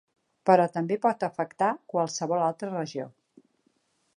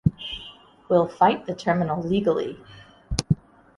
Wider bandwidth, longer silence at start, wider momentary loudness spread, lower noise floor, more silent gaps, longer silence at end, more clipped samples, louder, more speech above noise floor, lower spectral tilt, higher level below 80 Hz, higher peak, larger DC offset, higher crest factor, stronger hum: about the same, 11 kHz vs 11.5 kHz; first, 0.45 s vs 0.05 s; about the same, 11 LU vs 13 LU; first, -71 dBFS vs -46 dBFS; neither; first, 1.1 s vs 0.4 s; neither; second, -27 LUFS vs -24 LUFS; first, 45 dB vs 24 dB; about the same, -5.5 dB/octave vs -6 dB/octave; second, -80 dBFS vs -44 dBFS; second, -6 dBFS vs -2 dBFS; neither; about the same, 22 dB vs 22 dB; neither